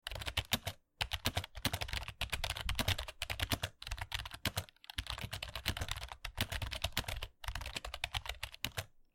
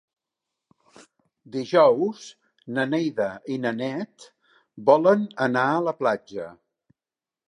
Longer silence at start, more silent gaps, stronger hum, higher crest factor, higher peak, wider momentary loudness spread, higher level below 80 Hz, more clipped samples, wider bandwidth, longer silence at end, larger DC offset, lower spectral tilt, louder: second, 0.05 s vs 1.55 s; neither; neither; about the same, 26 dB vs 22 dB; second, -14 dBFS vs -4 dBFS; second, 8 LU vs 18 LU; first, -48 dBFS vs -74 dBFS; neither; first, 17 kHz vs 10.5 kHz; second, 0.15 s vs 0.95 s; neither; second, -3 dB/octave vs -6.5 dB/octave; second, -40 LUFS vs -23 LUFS